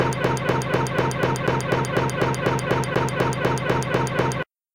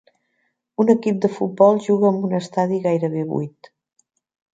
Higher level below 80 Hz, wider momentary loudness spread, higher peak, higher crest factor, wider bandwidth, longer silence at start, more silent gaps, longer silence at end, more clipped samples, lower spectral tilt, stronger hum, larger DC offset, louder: first, -46 dBFS vs -68 dBFS; second, 1 LU vs 10 LU; second, -6 dBFS vs -2 dBFS; about the same, 16 dB vs 18 dB; first, 17 kHz vs 9 kHz; second, 0 s vs 0.8 s; neither; second, 0.3 s vs 1.05 s; neither; second, -5.5 dB/octave vs -8 dB/octave; neither; first, 0.3% vs under 0.1%; second, -23 LUFS vs -19 LUFS